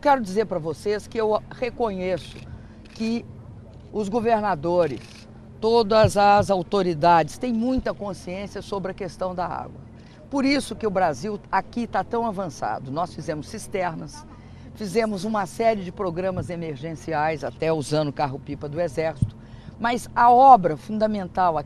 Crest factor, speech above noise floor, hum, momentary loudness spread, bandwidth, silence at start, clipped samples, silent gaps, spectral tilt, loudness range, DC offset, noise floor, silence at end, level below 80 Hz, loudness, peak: 22 dB; 19 dB; none; 17 LU; 13 kHz; 0.05 s; under 0.1%; none; -6 dB/octave; 8 LU; under 0.1%; -42 dBFS; 0 s; -48 dBFS; -23 LUFS; 0 dBFS